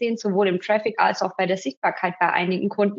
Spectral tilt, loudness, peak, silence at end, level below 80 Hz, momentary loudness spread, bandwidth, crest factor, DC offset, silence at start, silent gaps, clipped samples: -4 dB/octave; -22 LUFS; -4 dBFS; 0 s; -82 dBFS; 3 LU; 7.6 kHz; 18 dB; under 0.1%; 0 s; 1.77-1.82 s; under 0.1%